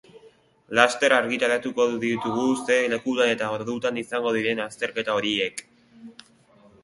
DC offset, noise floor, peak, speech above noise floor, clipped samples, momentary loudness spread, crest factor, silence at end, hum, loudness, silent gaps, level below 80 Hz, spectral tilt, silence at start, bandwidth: under 0.1%; -56 dBFS; 0 dBFS; 32 dB; under 0.1%; 7 LU; 24 dB; 0.7 s; none; -23 LUFS; none; -66 dBFS; -3.5 dB/octave; 0.15 s; 11.5 kHz